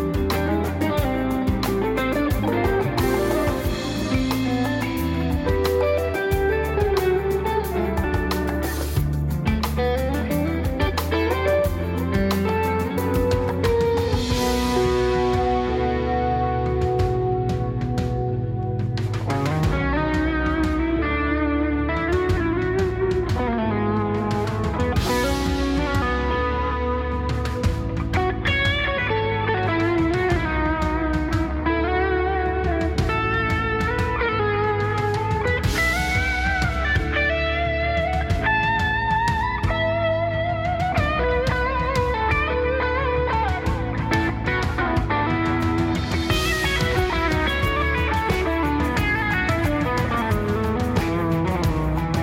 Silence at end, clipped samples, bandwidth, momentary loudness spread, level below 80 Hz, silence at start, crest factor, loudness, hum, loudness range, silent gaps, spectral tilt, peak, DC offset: 0 s; under 0.1%; 17 kHz; 3 LU; -30 dBFS; 0 s; 14 dB; -22 LUFS; none; 2 LU; none; -6 dB/octave; -8 dBFS; under 0.1%